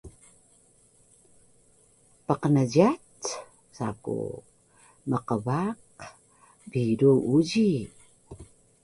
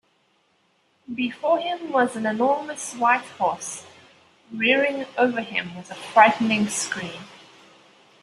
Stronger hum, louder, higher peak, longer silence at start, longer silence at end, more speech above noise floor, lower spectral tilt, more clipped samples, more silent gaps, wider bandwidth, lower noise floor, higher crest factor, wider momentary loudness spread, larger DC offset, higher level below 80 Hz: neither; second, -26 LUFS vs -22 LUFS; second, -6 dBFS vs -2 dBFS; second, 0.05 s vs 1.1 s; second, 0.4 s vs 0.85 s; second, 37 dB vs 43 dB; first, -7 dB/octave vs -3.5 dB/octave; neither; neither; about the same, 11.5 kHz vs 12.5 kHz; second, -61 dBFS vs -65 dBFS; about the same, 22 dB vs 22 dB; first, 24 LU vs 18 LU; neither; first, -60 dBFS vs -70 dBFS